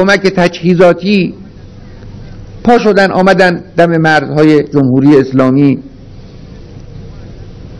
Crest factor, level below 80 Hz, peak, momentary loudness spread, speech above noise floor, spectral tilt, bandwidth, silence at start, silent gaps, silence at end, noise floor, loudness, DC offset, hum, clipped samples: 10 dB; -36 dBFS; 0 dBFS; 20 LU; 23 dB; -7 dB/octave; 11 kHz; 0 s; none; 0 s; -31 dBFS; -9 LUFS; under 0.1%; none; 3%